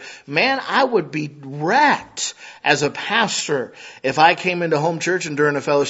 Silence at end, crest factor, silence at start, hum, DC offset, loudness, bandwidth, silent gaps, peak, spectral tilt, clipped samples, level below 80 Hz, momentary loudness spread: 0 s; 20 dB; 0 s; none; under 0.1%; -19 LUFS; 8 kHz; none; 0 dBFS; -3.5 dB/octave; under 0.1%; -64 dBFS; 11 LU